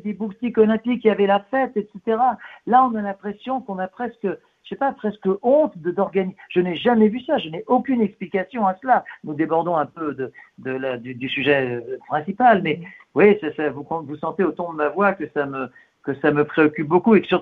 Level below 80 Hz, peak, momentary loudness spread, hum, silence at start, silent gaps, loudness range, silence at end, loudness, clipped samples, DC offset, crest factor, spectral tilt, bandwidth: -62 dBFS; -2 dBFS; 12 LU; none; 0.05 s; none; 3 LU; 0 s; -21 LUFS; under 0.1%; under 0.1%; 20 dB; -9 dB/octave; 4.5 kHz